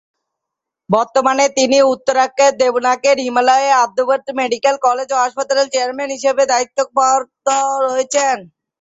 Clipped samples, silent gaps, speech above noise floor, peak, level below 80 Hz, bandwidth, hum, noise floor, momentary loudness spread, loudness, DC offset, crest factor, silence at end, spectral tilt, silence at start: under 0.1%; none; 67 dB; -2 dBFS; -64 dBFS; 8.2 kHz; none; -81 dBFS; 5 LU; -15 LUFS; under 0.1%; 14 dB; 0.35 s; -2.5 dB/octave; 0.9 s